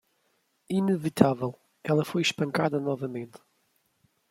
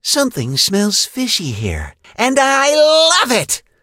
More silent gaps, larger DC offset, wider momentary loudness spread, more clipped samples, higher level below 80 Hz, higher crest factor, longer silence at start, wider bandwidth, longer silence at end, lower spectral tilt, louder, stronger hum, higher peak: neither; neither; about the same, 12 LU vs 12 LU; neither; second, -68 dBFS vs -38 dBFS; first, 26 dB vs 14 dB; first, 0.7 s vs 0.05 s; about the same, 16 kHz vs 16.5 kHz; first, 0.95 s vs 0.25 s; first, -6 dB/octave vs -2.5 dB/octave; second, -27 LUFS vs -13 LUFS; neither; second, -4 dBFS vs 0 dBFS